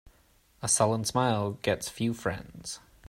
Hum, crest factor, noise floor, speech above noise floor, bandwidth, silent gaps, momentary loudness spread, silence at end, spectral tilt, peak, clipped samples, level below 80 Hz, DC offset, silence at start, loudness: none; 20 dB; -64 dBFS; 35 dB; 16 kHz; none; 15 LU; 0.3 s; -4 dB/octave; -10 dBFS; under 0.1%; -58 dBFS; under 0.1%; 0.6 s; -29 LUFS